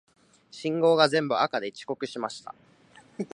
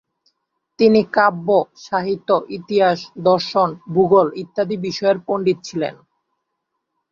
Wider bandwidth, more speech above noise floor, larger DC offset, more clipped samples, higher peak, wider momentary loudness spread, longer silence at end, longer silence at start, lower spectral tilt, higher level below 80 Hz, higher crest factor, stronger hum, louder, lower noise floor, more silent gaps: first, 11 kHz vs 7.4 kHz; second, 30 dB vs 59 dB; neither; neither; about the same, -4 dBFS vs -2 dBFS; first, 20 LU vs 9 LU; second, 0.1 s vs 1.2 s; second, 0.55 s vs 0.8 s; about the same, -5 dB/octave vs -6 dB/octave; second, -78 dBFS vs -62 dBFS; first, 24 dB vs 18 dB; neither; second, -26 LUFS vs -18 LUFS; second, -56 dBFS vs -76 dBFS; neither